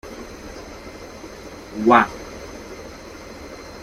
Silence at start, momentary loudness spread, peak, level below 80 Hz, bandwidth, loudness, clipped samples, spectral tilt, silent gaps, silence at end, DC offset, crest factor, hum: 0.05 s; 22 LU; -2 dBFS; -46 dBFS; 15.5 kHz; -17 LUFS; under 0.1%; -5 dB/octave; none; 0 s; under 0.1%; 24 dB; none